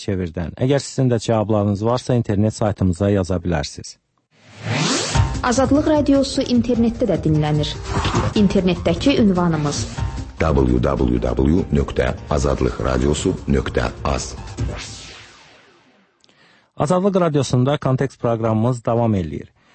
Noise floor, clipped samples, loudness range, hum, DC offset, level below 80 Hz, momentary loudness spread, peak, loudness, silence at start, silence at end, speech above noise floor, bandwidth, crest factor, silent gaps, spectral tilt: -56 dBFS; under 0.1%; 5 LU; none; under 0.1%; -32 dBFS; 10 LU; -4 dBFS; -19 LUFS; 0 s; 0.3 s; 38 dB; 8.8 kHz; 16 dB; none; -6 dB/octave